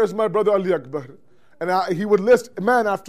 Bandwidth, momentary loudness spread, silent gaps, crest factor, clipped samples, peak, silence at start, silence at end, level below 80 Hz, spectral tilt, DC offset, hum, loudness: 15 kHz; 12 LU; none; 14 dB; under 0.1%; -6 dBFS; 0 s; 0 s; -62 dBFS; -6 dB/octave; 0.4%; none; -20 LUFS